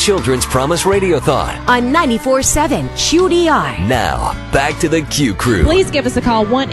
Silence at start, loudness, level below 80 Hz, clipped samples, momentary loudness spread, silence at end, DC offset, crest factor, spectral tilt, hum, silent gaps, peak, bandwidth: 0 s; -14 LUFS; -26 dBFS; under 0.1%; 4 LU; 0 s; under 0.1%; 12 dB; -4 dB/octave; none; none; 0 dBFS; 13 kHz